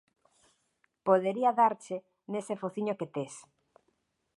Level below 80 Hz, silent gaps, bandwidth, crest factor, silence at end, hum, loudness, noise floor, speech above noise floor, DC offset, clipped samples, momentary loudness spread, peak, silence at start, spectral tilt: -84 dBFS; none; 11.5 kHz; 22 dB; 1 s; none; -31 LUFS; -77 dBFS; 47 dB; under 0.1%; under 0.1%; 15 LU; -10 dBFS; 1.05 s; -6 dB/octave